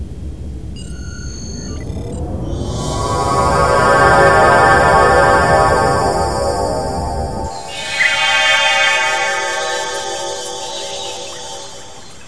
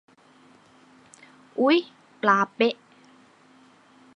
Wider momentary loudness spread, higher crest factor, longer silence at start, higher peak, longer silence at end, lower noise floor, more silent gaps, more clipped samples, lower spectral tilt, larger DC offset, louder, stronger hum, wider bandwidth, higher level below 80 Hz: about the same, 19 LU vs 17 LU; second, 16 dB vs 22 dB; second, 0 s vs 1.55 s; first, 0 dBFS vs -6 dBFS; second, 0 s vs 1.45 s; second, -36 dBFS vs -56 dBFS; neither; neither; second, -3.5 dB/octave vs -5 dB/octave; first, 2% vs under 0.1%; first, -14 LUFS vs -23 LUFS; neither; about the same, 11 kHz vs 10 kHz; first, -30 dBFS vs -84 dBFS